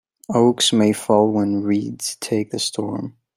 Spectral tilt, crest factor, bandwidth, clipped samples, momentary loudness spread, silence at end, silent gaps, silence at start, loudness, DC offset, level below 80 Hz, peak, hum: -4.5 dB/octave; 18 dB; 16 kHz; under 0.1%; 11 LU; 0.25 s; none; 0.3 s; -19 LUFS; under 0.1%; -62 dBFS; -2 dBFS; none